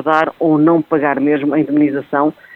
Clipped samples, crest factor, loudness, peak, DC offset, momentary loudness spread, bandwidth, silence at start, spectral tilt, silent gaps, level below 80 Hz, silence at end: under 0.1%; 14 dB; -14 LUFS; 0 dBFS; under 0.1%; 4 LU; 4.9 kHz; 0 s; -9 dB/octave; none; -60 dBFS; 0 s